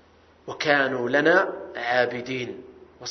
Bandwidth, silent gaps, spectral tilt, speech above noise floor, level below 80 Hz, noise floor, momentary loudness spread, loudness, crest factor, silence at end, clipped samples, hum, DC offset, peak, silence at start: 6.4 kHz; none; -4.5 dB/octave; 21 dB; -66 dBFS; -45 dBFS; 17 LU; -23 LUFS; 20 dB; 0 s; under 0.1%; none; under 0.1%; -4 dBFS; 0.45 s